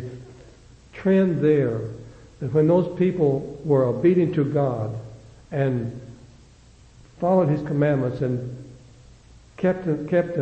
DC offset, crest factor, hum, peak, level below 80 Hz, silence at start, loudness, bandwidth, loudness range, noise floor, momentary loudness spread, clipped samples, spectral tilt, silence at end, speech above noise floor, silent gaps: under 0.1%; 16 dB; none; -8 dBFS; -52 dBFS; 0 s; -22 LUFS; 8.4 kHz; 5 LU; -50 dBFS; 17 LU; under 0.1%; -9.5 dB/octave; 0 s; 29 dB; none